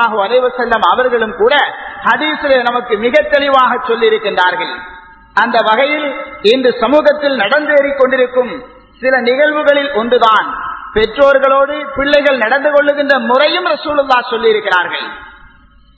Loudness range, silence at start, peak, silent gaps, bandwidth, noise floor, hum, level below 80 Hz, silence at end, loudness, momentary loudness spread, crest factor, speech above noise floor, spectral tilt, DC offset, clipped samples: 2 LU; 0 s; 0 dBFS; none; 8 kHz; -44 dBFS; none; -44 dBFS; 0.65 s; -12 LUFS; 8 LU; 12 dB; 32 dB; -5 dB/octave; under 0.1%; 0.2%